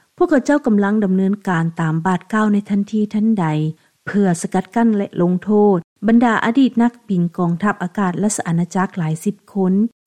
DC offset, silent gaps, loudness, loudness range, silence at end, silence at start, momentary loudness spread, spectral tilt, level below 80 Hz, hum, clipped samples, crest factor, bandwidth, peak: 0.2%; 5.84-5.96 s; -17 LUFS; 3 LU; 0.2 s; 0.2 s; 6 LU; -7 dB/octave; -56 dBFS; none; under 0.1%; 14 dB; 13 kHz; -4 dBFS